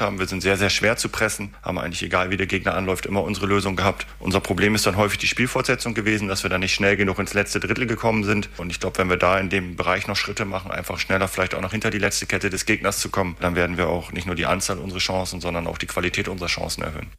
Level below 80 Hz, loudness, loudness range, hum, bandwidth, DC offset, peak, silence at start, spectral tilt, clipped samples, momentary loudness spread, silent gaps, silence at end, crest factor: -42 dBFS; -22 LUFS; 3 LU; none; 15.5 kHz; under 0.1%; -6 dBFS; 0 s; -4 dB/octave; under 0.1%; 8 LU; none; 0 s; 16 dB